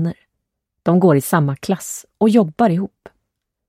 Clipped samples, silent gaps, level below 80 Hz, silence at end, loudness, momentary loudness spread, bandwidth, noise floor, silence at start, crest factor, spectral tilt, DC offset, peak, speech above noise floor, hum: under 0.1%; none; -58 dBFS; 0.8 s; -17 LUFS; 11 LU; 16 kHz; -76 dBFS; 0 s; 16 dB; -7 dB/octave; under 0.1%; -2 dBFS; 60 dB; none